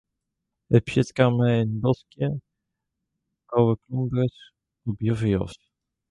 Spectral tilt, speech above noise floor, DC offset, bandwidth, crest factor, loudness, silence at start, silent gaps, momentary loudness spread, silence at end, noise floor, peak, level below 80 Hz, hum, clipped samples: -8 dB/octave; 59 dB; under 0.1%; 10.5 kHz; 20 dB; -24 LUFS; 0.7 s; none; 8 LU; 0.55 s; -82 dBFS; -4 dBFS; -50 dBFS; none; under 0.1%